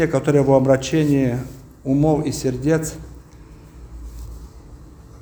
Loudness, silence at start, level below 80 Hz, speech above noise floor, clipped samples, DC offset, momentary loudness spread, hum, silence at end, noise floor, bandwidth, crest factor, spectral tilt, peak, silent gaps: -19 LUFS; 0 s; -40 dBFS; 25 dB; under 0.1%; under 0.1%; 23 LU; none; 0.05 s; -42 dBFS; over 20 kHz; 18 dB; -6.5 dB/octave; -2 dBFS; none